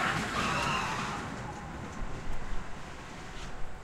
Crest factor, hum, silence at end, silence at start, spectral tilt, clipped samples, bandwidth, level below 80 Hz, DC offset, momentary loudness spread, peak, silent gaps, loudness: 16 dB; none; 0 s; 0 s; -4 dB/octave; under 0.1%; 13.5 kHz; -42 dBFS; under 0.1%; 14 LU; -18 dBFS; none; -35 LUFS